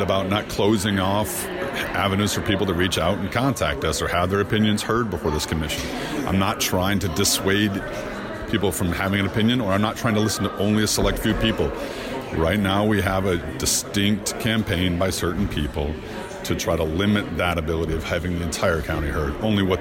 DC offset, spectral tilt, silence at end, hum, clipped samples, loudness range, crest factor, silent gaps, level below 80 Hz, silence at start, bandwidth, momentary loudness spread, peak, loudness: under 0.1%; -4.5 dB/octave; 0 s; none; under 0.1%; 2 LU; 14 dB; none; -36 dBFS; 0 s; 16.5 kHz; 6 LU; -8 dBFS; -22 LUFS